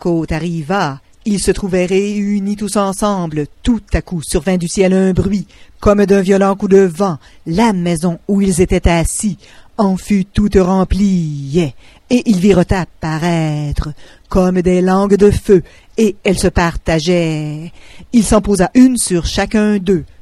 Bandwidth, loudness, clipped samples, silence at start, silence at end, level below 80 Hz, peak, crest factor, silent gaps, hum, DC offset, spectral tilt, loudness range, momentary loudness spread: 13 kHz; -14 LUFS; under 0.1%; 0.05 s; 0.15 s; -28 dBFS; 0 dBFS; 14 dB; none; none; under 0.1%; -6 dB/octave; 3 LU; 9 LU